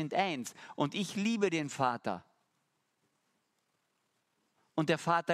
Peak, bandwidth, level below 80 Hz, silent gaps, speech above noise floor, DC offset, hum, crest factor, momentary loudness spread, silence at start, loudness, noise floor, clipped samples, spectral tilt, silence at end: -14 dBFS; 14.5 kHz; -80 dBFS; none; 46 dB; under 0.1%; none; 22 dB; 10 LU; 0 s; -34 LUFS; -79 dBFS; under 0.1%; -5 dB/octave; 0 s